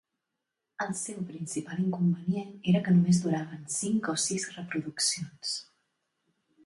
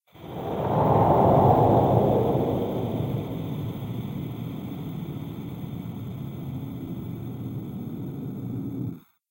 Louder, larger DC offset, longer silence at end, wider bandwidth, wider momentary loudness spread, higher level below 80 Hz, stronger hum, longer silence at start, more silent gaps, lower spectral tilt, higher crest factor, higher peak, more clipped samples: second, -30 LUFS vs -26 LUFS; neither; first, 1.05 s vs 0.3 s; second, 11.5 kHz vs 16 kHz; second, 12 LU vs 16 LU; second, -70 dBFS vs -48 dBFS; neither; first, 0.8 s vs 0.15 s; neither; second, -4.5 dB/octave vs -9.5 dB/octave; about the same, 16 dB vs 18 dB; second, -14 dBFS vs -6 dBFS; neither